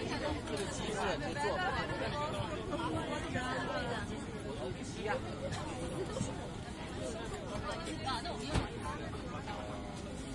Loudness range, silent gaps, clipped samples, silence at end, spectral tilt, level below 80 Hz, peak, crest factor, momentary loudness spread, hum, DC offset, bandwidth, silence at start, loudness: 4 LU; none; under 0.1%; 0 s; -5 dB/octave; -50 dBFS; -18 dBFS; 20 dB; 6 LU; none; under 0.1%; 11.5 kHz; 0 s; -39 LUFS